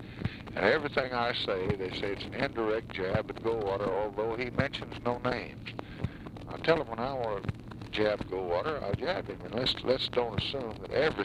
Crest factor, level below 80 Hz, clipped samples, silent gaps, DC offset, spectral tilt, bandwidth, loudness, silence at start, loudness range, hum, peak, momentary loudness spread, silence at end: 22 dB; -52 dBFS; under 0.1%; none; under 0.1%; -6.5 dB/octave; 12 kHz; -32 LUFS; 0 s; 2 LU; none; -10 dBFS; 10 LU; 0 s